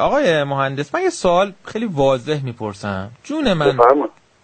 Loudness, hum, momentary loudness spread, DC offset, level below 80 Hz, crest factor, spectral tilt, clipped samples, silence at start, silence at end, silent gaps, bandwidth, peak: -18 LUFS; none; 13 LU; under 0.1%; -46 dBFS; 18 dB; -5.5 dB/octave; under 0.1%; 0 s; 0.35 s; none; 9 kHz; 0 dBFS